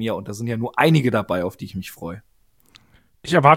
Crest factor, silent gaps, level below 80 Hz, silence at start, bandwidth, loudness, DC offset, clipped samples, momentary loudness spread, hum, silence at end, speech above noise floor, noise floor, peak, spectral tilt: 20 dB; none; -54 dBFS; 0 s; 16 kHz; -21 LUFS; under 0.1%; under 0.1%; 18 LU; none; 0 s; 36 dB; -55 dBFS; 0 dBFS; -6.5 dB/octave